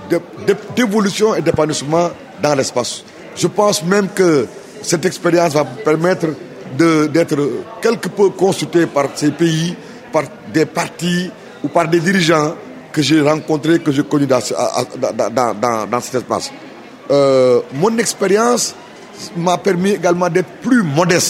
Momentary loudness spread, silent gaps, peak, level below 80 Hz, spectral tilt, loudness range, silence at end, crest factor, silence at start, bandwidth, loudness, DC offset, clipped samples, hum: 9 LU; none; 0 dBFS; -56 dBFS; -5 dB/octave; 2 LU; 0 s; 16 dB; 0 s; 16 kHz; -15 LUFS; under 0.1%; under 0.1%; none